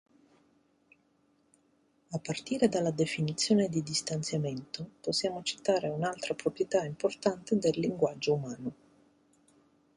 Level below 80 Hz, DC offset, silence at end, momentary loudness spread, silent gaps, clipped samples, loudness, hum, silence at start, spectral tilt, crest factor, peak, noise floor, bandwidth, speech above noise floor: -70 dBFS; under 0.1%; 1.25 s; 11 LU; none; under 0.1%; -31 LUFS; none; 2.1 s; -5 dB/octave; 20 dB; -12 dBFS; -70 dBFS; 11.5 kHz; 39 dB